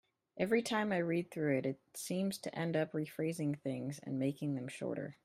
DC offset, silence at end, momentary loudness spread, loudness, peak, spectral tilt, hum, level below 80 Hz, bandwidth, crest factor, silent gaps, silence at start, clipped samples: under 0.1%; 0.1 s; 7 LU; -37 LUFS; -18 dBFS; -6 dB/octave; none; -78 dBFS; 16 kHz; 18 dB; none; 0.35 s; under 0.1%